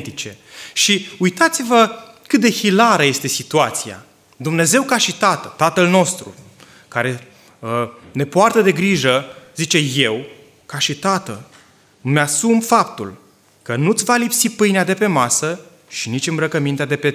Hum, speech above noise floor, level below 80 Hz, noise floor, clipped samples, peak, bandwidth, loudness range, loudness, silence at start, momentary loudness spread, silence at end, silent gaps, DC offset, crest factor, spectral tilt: none; 32 dB; -60 dBFS; -49 dBFS; under 0.1%; 0 dBFS; 16 kHz; 4 LU; -16 LUFS; 0 s; 15 LU; 0 s; none; under 0.1%; 16 dB; -3.5 dB/octave